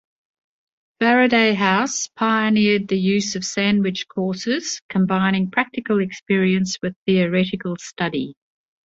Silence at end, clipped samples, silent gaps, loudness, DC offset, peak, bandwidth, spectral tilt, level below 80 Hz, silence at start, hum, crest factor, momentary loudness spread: 0.5 s; under 0.1%; 4.82-4.89 s, 6.22-6.26 s, 6.96-7.06 s; -20 LUFS; under 0.1%; -2 dBFS; 7.8 kHz; -4.5 dB/octave; -60 dBFS; 1 s; none; 18 dB; 9 LU